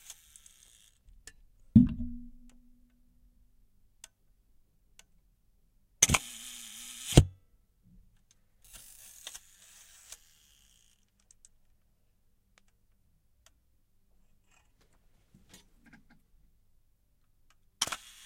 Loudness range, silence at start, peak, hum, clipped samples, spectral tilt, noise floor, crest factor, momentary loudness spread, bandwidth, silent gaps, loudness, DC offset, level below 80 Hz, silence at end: 21 LU; 1.75 s; -2 dBFS; none; under 0.1%; -4 dB/octave; -69 dBFS; 34 dB; 27 LU; 16 kHz; none; -28 LUFS; under 0.1%; -46 dBFS; 0.3 s